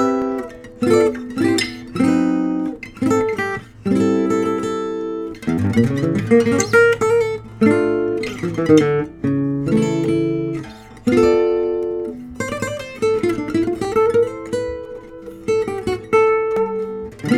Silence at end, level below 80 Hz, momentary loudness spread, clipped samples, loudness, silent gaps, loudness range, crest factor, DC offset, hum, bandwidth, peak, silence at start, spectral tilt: 0 s; -46 dBFS; 11 LU; under 0.1%; -18 LUFS; none; 4 LU; 18 dB; under 0.1%; none; 13.5 kHz; 0 dBFS; 0 s; -6 dB/octave